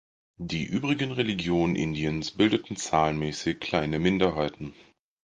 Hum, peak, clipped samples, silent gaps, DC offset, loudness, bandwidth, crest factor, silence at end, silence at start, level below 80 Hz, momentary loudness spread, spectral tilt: none; -8 dBFS; under 0.1%; none; under 0.1%; -27 LUFS; 9.8 kHz; 20 dB; 0.5 s; 0.4 s; -50 dBFS; 8 LU; -5.5 dB/octave